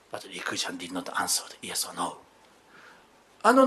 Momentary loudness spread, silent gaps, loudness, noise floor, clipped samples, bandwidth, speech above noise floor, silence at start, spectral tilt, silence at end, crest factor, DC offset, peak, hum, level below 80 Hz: 9 LU; none; -30 LUFS; -58 dBFS; under 0.1%; 13 kHz; 25 dB; 0.15 s; -2 dB/octave; 0 s; 24 dB; under 0.1%; -4 dBFS; none; -76 dBFS